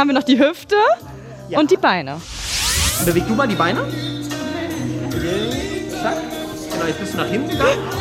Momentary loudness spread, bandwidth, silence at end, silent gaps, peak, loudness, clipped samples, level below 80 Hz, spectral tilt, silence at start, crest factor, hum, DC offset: 10 LU; 16.5 kHz; 0 s; none; -2 dBFS; -19 LUFS; under 0.1%; -38 dBFS; -4 dB/octave; 0 s; 16 dB; none; under 0.1%